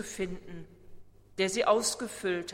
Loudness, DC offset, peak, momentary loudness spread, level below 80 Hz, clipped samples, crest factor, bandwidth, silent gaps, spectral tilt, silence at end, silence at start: -30 LUFS; under 0.1%; -12 dBFS; 20 LU; -56 dBFS; under 0.1%; 22 dB; 16 kHz; none; -3 dB/octave; 0 s; 0 s